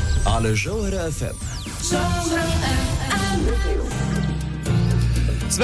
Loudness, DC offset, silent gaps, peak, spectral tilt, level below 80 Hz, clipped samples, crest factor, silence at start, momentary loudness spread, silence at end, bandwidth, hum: -22 LUFS; under 0.1%; none; -8 dBFS; -5 dB/octave; -26 dBFS; under 0.1%; 12 dB; 0 s; 6 LU; 0 s; 11 kHz; none